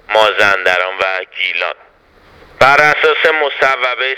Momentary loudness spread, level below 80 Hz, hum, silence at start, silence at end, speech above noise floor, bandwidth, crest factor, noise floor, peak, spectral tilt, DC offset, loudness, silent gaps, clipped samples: 9 LU; -50 dBFS; none; 0.1 s; 0 s; 33 dB; 19 kHz; 14 dB; -46 dBFS; 0 dBFS; -2.5 dB/octave; under 0.1%; -12 LUFS; none; 0.2%